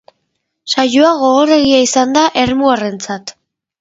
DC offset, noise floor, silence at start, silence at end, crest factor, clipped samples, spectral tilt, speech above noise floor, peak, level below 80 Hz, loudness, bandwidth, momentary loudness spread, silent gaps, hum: under 0.1%; -69 dBFS; 0.65 s; 0.5 s; 12 dB; under 0.1%; -3 dB/octave; 58 dB; 0 dBFS; -48 dBFS; -12 LUFS; 7.8 kHz; 14 LU; none; none